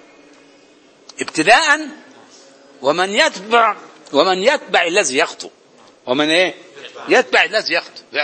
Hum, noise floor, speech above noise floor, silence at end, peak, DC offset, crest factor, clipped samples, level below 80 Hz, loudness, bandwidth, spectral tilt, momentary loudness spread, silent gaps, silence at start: none; -49 dBFS; 33 dB; 0 s; 0 dBFS; under 0.1%; 18 dB; under 0.1%; -64 dBFS; -15 LUFS; 11 kHz; -2 dB/octave; 20 LU; none; 1.2 s